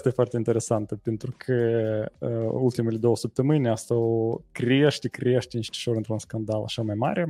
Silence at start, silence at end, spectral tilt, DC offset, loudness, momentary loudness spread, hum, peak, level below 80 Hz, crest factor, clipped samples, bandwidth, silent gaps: 0 s; 0 s; -6.5 dB/octave; under 0.1%; -26 LUFS; 7 LU; none; -8 dBFS; -60 dBFS; 18 dB; under 0.1%; 12.5 kHz; none